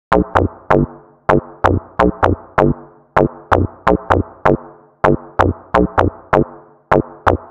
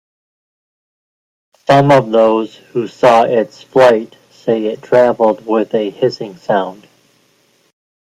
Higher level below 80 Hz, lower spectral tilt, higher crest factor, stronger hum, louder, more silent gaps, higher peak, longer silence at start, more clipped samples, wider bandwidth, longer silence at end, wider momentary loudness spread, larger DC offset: first, -30 dBFS vs -56 dBFS; first, -8 dB/octave vs -6.5 dB/octave; about the same, 16 dB vs 14 dB; neither; second, -16 LUFS vs -13 LUFS; neither; about the same, 0 dBFS vs 0 dBFS; second, 0.1 s vs 1.7 s; first, 0.4% vs under 0.1%; second, 10.5 kHz vs 12 kHz; second, 0.05 s vs 1.35 s; second, 3 LU vs 12 LU; neither